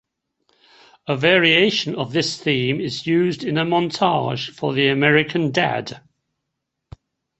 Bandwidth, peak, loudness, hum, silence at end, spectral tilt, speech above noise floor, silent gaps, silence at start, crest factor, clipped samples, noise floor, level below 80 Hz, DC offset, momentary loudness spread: 8.4 kHz; 0 dBFS; -19 LUFS; none; 1.4 s; -5 dB/octave; 60 dB; none; 1.05 s; 20 dB; under 0.1%; -79 dBFS; -58 dBFS; under 0.1%; 10 LU